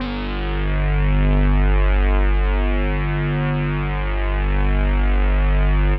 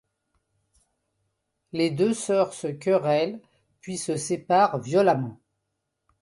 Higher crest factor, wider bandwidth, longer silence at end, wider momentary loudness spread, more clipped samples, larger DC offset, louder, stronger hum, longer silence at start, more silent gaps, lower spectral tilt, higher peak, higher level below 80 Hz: second, 12 dB vs 18 dB; second, 4.5 kHz vs 11.5 kHz; second, 0 s vs 0.85 s; second, 5 LU vs 14 LU; neither; neither; first, -20 LUFS vs -24 LUFS; first, 50 Hz at -25 dBFS vs none; second, 0 s vs 1.75 s; neither; first, -10.5 dB/octave vs -5.5 dB/octave; about the same, -6 dBFS vs -8 dBFS; first, -18 dBFS vs -68 dBFS